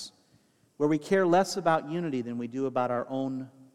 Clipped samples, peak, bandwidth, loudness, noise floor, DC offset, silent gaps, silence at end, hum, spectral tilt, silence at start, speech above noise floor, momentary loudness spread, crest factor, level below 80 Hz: under 0.1%; -10 dBFS; 14.5 kHz; -28 LUFS; -65 dBFS; under 0.1%; none; 0.1 s; none; -6 dB/octave; 0 s; 37 dB; 11 LU; 18 dB; -72 dBFS